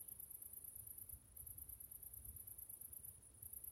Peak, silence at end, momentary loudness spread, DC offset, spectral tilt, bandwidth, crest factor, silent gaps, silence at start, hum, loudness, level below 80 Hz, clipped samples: -38 dBFS; 0 s; 3 LU; under 0.1%; -3 dB/octave; 19 kHz; 18 dB; none; 0 s; none; -53 LUFS; -70 dBFS; under 0.1%